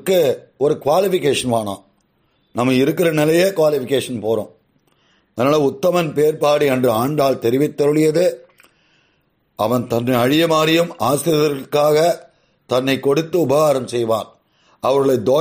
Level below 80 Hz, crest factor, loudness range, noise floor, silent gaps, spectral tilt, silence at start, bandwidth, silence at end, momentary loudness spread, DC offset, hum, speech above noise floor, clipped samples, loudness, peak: -58 dBFS; 14 dB; 2 LU; -63 dBFS; none; -5.5 dB/octave; 0.05 s; 15.5 kHz; 0 s; 7 LU; under 0.1%; none; 47 dB; under 0.1%; -17 LUFS; -4 dBFS